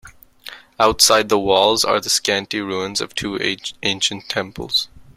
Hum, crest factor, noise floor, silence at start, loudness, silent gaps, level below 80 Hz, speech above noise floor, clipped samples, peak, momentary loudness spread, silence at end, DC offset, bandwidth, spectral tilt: none; 20 dB; -40 dBFS; 0.05 s; -18 LUFS; none; -48 dBFS; 21 dB; under 0.1%; 0 dBFS; 11 LU; 0.15 s; under 0.1%; 16 kHz; -2 dB/octave